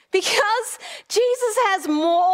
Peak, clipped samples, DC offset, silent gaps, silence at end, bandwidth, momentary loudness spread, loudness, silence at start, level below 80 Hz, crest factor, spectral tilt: -6 dBFS; under 0.1%; under 0.1%; none; 0 s; 16 kHz; 7 LU; -20 LUFS; 0.15 s; -74 dBFS; 14 dB; -0.5 dB/octave